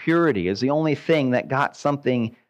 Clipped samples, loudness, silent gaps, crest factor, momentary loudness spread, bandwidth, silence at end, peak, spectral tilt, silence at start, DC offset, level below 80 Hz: under 0.1%; -22 LUFS; none; 14 dB; 4 LU; 8.8 kHz; 0.2 s; -8 dBFS; -7 dB/octave; 0 s; under 0.1%; -62 dBFS